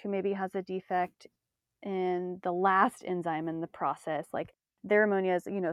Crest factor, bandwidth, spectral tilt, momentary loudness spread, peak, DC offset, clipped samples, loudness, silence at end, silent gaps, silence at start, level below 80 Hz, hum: 20 dB; 13 kHz; -7 dB/octave; 12 LU; -10 dBFS; under 0.1%; under 0.1%; -31 LUFS; 0 s; none; 0.05 s; -78 dBFS; none